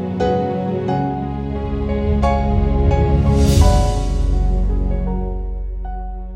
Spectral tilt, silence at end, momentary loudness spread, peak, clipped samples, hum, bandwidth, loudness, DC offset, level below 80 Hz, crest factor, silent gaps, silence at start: -7.5 dB/octave; 0 s; 13 LU; 0 dBFS; under 0.1%; none; 15.5 kHz; -19 LUFS; under 0.1%; -20 dBFS; 16 dB; none; 0 s